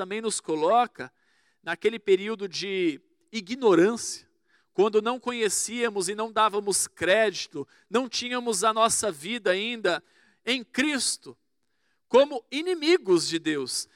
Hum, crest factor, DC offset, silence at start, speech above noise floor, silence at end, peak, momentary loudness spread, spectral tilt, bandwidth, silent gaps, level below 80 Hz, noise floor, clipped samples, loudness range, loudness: none; 18 dB; under 0.1%; 0 s; 51 dB; 0.1 s; -8 dBFS; 12 LU; -2.5 dB/octave; 16 kHz; none; -72 dBFS; -76 dBFS; under 0.1%; 2 LU; -25 LUFS